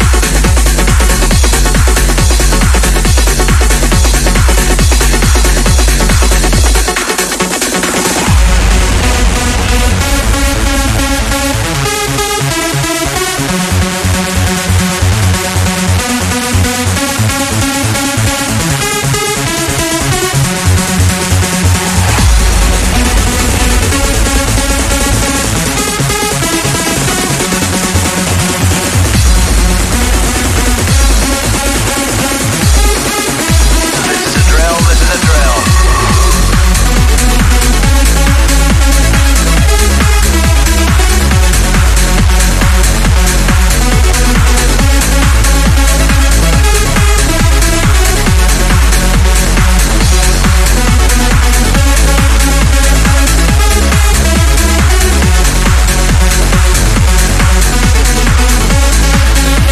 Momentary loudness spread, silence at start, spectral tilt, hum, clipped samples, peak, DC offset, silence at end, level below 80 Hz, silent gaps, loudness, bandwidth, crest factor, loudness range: 3 LU; 0 s; -3.5 dB/octave; none; under 0.1%; 0 dBFS; under 0.1%; 0 s; -10 dBFS; none; -9 LUFS; 14.5 kHz; 8 dB; 2 LU